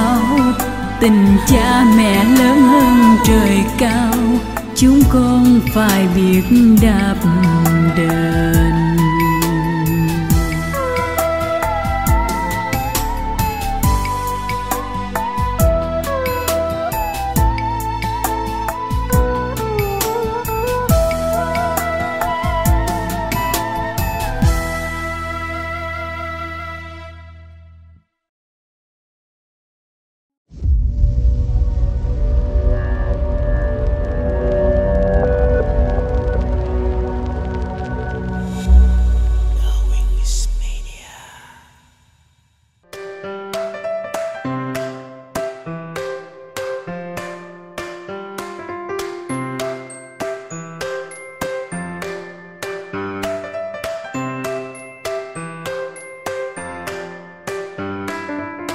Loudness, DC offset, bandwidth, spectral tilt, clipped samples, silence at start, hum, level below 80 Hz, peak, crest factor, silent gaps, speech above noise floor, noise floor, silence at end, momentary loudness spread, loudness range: -17 LUFS; under 0.1%; 16 kHz; -6 dB/octave; under 0.1%; 0 s; none; -22 dBFS; 0 dBFS; 16 dB; 28.29-30.30 s, 30.37-30.45 s; 47 dB; -58 dBFS; 0 s; 17 LU; 16 LU